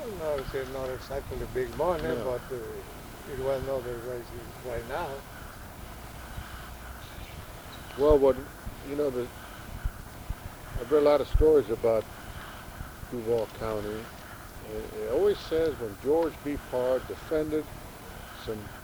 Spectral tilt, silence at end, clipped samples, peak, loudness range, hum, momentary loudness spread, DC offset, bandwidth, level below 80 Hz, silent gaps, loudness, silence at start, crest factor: -6 dB/octave; 0 s; under 0.1%; -10 dBFS; 8 LU; none; 19 LU; under 0.1%; over 20 kHz; -42 dBFS; none; -30 LUFS; 0 s; 22 dB